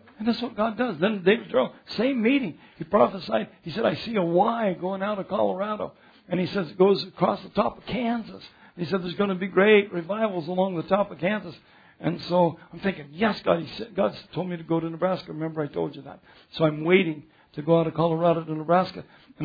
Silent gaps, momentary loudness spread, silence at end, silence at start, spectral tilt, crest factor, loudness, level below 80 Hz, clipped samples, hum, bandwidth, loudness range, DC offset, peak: none; 11 LU; 0 s; 0.2 s; -8.5 dB/octave; 20 dB; -25 LUFS; -62 dBFS; under 0.1%; none; 5 kHz; 3 LU; under 0.1%; -6 dBFS